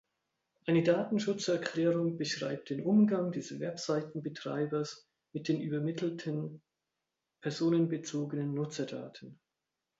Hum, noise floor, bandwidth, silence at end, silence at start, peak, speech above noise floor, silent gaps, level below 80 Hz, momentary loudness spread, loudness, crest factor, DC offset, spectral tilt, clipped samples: none; -88 dBFS; 8 kHz; 0.65 s; 0.65 s; -16 dBFS; 55 dB; none; -78 dBFS; 13 LU; -33 LUFS; 18 dB; under 0.1%; -6 dB/octave; under 0.1%